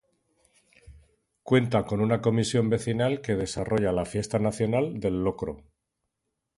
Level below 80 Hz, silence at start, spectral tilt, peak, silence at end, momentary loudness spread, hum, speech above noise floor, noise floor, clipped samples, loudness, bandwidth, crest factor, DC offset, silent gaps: -50 dBFS; 0.85 s; -6.5 dB/octave; -8 dBFS; 1 s; 5 LU; none; 57 dB; -82 dBFS; under 0.1%; -26 LUFS; 11.5 kHz; 18 dB; under 0.1%; none